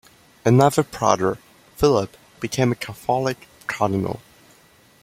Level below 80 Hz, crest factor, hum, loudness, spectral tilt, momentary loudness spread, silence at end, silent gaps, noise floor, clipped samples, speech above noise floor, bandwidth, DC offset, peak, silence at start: -50 dBFS; 22 dB; none; -21 LUFS; -6 dB/octave; 15 LU; 0.85 s; none; -54 dBFS; under 0.1%; 34 dB; 16 kHz; under 0.1%; 0 dBFS; 0.45 s